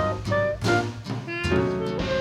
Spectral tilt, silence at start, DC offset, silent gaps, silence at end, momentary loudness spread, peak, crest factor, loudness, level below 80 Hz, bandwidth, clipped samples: -6 dB/octave; 0 s; under 0.1%; none; 0 s; 7 LU; -8 dBFS; 16 dB; -25 LUFS; -42 dBFS; 13.5 kHz; under 0.1%